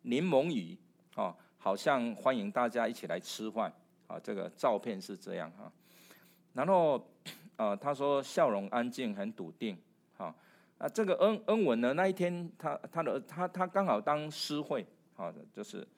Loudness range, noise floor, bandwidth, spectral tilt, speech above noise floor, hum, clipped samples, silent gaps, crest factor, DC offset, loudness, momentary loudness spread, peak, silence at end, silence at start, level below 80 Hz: 4 LU; -62 dBFS; 16 kHz; -5.5 dB/octave; 29 dB; none; under 0.1%; none; 20 dB; under 0.1%; -34 LUFS; 16 LU; -14 dBFS; 0.1 s; 0.05 s; -90 dBFS